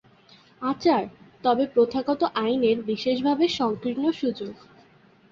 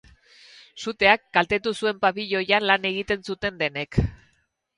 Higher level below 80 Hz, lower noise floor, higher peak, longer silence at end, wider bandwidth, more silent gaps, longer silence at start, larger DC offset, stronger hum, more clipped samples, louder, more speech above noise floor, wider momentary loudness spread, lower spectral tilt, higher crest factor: second, -64 dBFS vs -42 dBFS; second, -56 dBFS vs -68 dBFS; second, -10 dBFS vs -2 dBFS; first, 0.75 s vs 0.6 s; second, 7.4 kHz vs 11 kHz; neither; second, 0.6 s vs 0.75 s; neither; neither; neither; about the same, -24 LUFS vs -23 LUFS; second, 32 dB vs 45 dB; about the same, 8 LU vs 10 LU; about the same, -6 dB/octave vs -5 dB/octave; second, 16 dB vs 24 dB